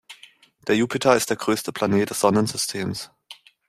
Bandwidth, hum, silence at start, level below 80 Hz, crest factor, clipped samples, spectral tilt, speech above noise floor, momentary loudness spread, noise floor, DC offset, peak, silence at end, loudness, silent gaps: 15.5 kHz; none; 0.1 s; -60 dBFS; 20 dB; under 0.1%; -4 dB/octave; 30 dB; 12 LU; -52 dBFS; under 0.1%; -2 dBFS; 0.35 s; -22 LUFS; none